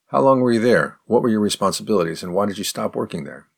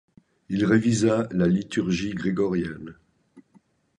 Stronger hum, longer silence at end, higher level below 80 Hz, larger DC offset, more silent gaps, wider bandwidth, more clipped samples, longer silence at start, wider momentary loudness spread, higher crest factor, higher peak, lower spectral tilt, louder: neither; second, 0.15 s vs 0.6 s; second, -60 dBFS vs -54 dBFS; neither; neither; first, 19 kHz vs 10.5 kHz; neither; second, 0.1 s vs 0.5 s; second, 9 LU vs 12 LU; about the same, 16 dB vs 18 dB; first, -2 dBFS vs -8 dBFS; second, -5 dB/octave vs -6.5 dB/octave; first, -19 LUFS vs -24 LUFS